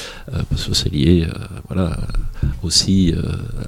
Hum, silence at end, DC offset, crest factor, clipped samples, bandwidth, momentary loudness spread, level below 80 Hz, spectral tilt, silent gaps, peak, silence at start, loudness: none; 0 s; under 0.1%; 18 dB; under 0.1%; 15.5 kHz; 11 LU; -26 dBFS; -5 dB/octave; none; 0 dBFS; 0 s; -19 LUFS